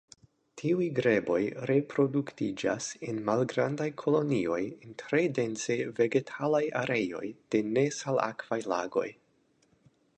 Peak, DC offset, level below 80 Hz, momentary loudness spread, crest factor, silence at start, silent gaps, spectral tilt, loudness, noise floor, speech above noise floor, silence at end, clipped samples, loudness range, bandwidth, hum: -12 dBFS; under 0.1%; -70 dBFS; 7 LU; 18 dB; 0.55 s; none; -5.5 dB/octave; -30 LUFS; -69 dBFS; 40 dB; 1.05 s; under 0.1%; 1 LU; 9.4 kHz; none